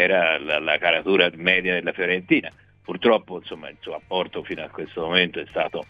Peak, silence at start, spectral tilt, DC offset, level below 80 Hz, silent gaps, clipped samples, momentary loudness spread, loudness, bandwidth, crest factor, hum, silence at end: -2 dBFS; 0 s; -6.5 dB/octave; under 0.1%; -58 dBFS; none; under 0.1%; 17 LU; -21 LUFS; 7.2 kHz; 22 dB; none; 0.05 s